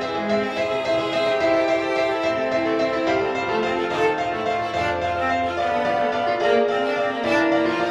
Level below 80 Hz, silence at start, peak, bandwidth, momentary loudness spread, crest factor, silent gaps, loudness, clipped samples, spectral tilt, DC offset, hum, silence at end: -52 dBFS; 0 s; -6 dBFS; 10.5 kHz; 4 LU; 14 dB; none; -21 LUFS; under 0.1%; -5 dB/octave; under 0.1%; none; 0 s